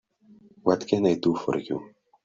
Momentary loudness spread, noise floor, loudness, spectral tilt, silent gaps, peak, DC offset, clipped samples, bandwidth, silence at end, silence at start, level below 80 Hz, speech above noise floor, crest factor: 10 LU; -55 dBFS; -26 LUFS; -7 dB/octave; none; -6 dBFS; under 0.1%; under 0.1%; 7.6 kHz; 0.35 s; 0.65 s; -64 dBFS; 31 dB; 20 dB